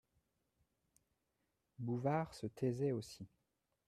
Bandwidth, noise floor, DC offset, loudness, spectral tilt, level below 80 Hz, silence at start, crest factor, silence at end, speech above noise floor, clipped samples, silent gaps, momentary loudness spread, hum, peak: 13.5 kHz; -86 dBFS; under 0.1%; -41 LUFS; -7.5 dB/octave; -76 dBFS; 1.8 s; 20 dB; 0.6 s; 45 dB; under 0.1%; none; 16 LU; none; -24 dBFS